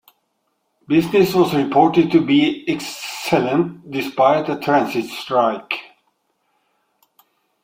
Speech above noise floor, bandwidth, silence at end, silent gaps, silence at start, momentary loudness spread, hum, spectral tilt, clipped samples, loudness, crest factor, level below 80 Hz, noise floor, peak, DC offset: 53 dB; 16.5 kHz; 1.8 s; none; 0.9 s; 11 LU; none; -6 dB/octave; under 0.1%; -18 LUFS; 18 dB; -60 dBFS; -70 dBFS; -2 dBFS; under 0.1%